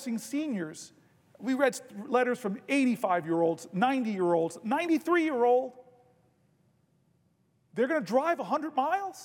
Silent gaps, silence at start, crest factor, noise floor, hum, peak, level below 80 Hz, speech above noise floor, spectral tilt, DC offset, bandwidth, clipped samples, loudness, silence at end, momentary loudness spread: none; 0 s; 18 dB; -70 dBFS; none; -12 dBFS; -86 dBFS; 42 dB; -5.5 dB/octave; under 0.1%; 17.5 kHz; under 0.1%; -29 LUFS; 0 s; 10 LU